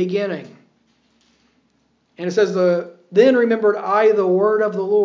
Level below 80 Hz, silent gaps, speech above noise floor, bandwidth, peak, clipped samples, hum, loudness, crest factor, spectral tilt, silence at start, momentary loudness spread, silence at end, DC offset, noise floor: -82 dBFS; none; 46 dB; 7.4 kHz; -2 dBFS; under 0.1%; none; -17 LUFS; 16 dB; -6.5 dB/octave; 0 s; 9 LU; 0 s; under 0.1%; -63 dBFS